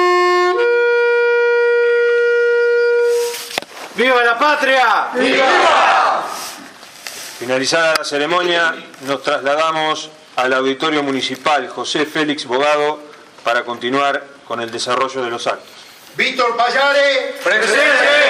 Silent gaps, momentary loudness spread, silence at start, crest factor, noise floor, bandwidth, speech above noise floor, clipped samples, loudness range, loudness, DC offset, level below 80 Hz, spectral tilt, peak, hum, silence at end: none; 12 LU; 0 s; 16 dB; -37 dBFS; 15.5 kHz; 21 dB; under 0.1%; 5 LU; -15 LUFS; under 0.1%; -68 dBFS; -2.5 dB/octave; 0 dBFS; none; 0 s